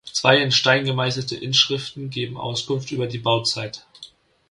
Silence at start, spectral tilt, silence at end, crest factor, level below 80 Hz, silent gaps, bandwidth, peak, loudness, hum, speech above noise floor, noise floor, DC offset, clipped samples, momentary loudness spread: 0.05 s; -3.5 dB/octave; 0.45 s; 22 dB; -60 dBFS; none; 11.5 kHz; 0 dBFS; -20 LUFS; none; 25 dB; -47 dBFS; under 0.1%; under 0.1%; 12 LU